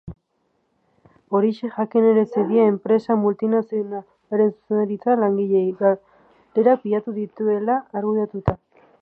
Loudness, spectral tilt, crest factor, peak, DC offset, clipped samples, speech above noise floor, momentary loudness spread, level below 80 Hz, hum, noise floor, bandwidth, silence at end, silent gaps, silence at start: -21 LUFS; -10.5 dB/octave; 20 dB; -2 dBFS; under 0.1%; under 0.1%; 49 dB; 9 LU; -50 dBFS; none; -69 dBFS; 5 kHz; 0.45 s; none; 0.05 s